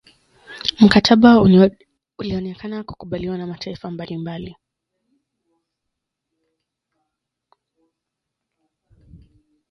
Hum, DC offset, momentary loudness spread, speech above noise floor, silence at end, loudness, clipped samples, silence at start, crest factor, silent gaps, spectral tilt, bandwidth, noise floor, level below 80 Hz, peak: none; under 0.1%; 20 LU; 65 dB; 5.2 s; -15 LUFS; under 0.1%; 0.5 s; 20 dB; none; -6.5 dB/octave; 11 kHz; -81 dBFS; -48 dBFS; 0 dBFS